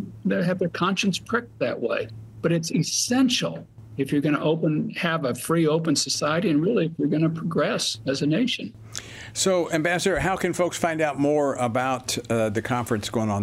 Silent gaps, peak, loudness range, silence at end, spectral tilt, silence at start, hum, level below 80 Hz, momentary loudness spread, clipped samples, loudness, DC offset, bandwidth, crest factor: none; -6 dBFS; 2 LU; 0 s; -4.5 dB/octave; 0 s; none; -54 dBFS; 7 LU; under 0.1%; -24 LUFS; under 0.1%; 15.5 kHz; 18 dB